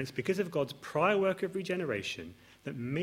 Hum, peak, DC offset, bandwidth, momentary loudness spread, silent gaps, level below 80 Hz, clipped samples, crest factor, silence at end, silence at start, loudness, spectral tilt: none; -14 dBFS; under 0.1%; 16 kHz; 15 LU; none; -70 dBFS; under 0.1%; 18 dB; 0 s; 0 s; -33 LUFS; -5.5 dB/octave